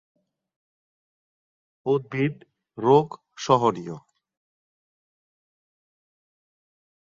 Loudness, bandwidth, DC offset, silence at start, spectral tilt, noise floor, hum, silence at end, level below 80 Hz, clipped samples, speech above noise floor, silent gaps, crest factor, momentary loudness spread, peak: -23 LUFS; 7.6 kHz; under 0.1%; 1.85 s; -6.5 dB/octave; under -90 dBFS; none; 3.15 s; -68 dBFS; under 0.1%; over 68 dB; none; 24 dB; 16 LU; -4 dBFS